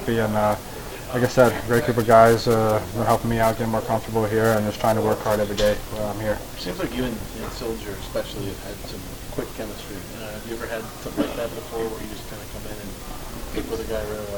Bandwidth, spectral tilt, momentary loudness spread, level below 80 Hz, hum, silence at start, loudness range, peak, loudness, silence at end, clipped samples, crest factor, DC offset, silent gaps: over 20 kHz; -5.5 dB/octave; 16 LU; -38 dBFS; none; 0 s; 12 LU; -2 dBFS; -23 LUFS; 0 s; under 0.1%; 22 dB; under 0.1%; none